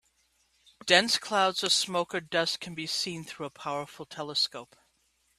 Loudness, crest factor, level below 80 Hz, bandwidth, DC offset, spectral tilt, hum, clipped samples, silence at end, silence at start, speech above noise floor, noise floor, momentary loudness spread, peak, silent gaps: -28 LUFS; 28 dB; -72 dBFS; 14.5 kHz; under 0.1%; -2 dB/octave; none; under 0.1%; 0.75 s; 0.85 s; 42 dB; -71 dBFS; 17 LU; -4 dBFS; none